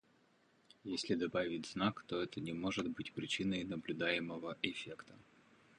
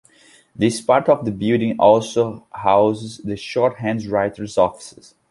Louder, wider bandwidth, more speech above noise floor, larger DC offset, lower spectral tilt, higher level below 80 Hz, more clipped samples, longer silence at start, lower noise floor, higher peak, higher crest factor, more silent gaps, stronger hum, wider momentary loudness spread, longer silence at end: second, -40 LUFS vs -19 LUFS; about the same, 10.5 kHz vs 11.5 kHz; about the same, 32 dB vs 33 dB; neither; about the same, -5 dB/octave vs -6 dB/octave; second, -70 dBFS vs -54 dBFS; neither; first, 0.85 s vs 0.6 s; first, -72 dBFS vs -52 dBFS; second, -18 dBFS vs -2 dBFS; first, 24 dB vs 18 dB; neither; neither; about the same, 9 LU vs 11 LU; first, 0.6 s vs 0.4 s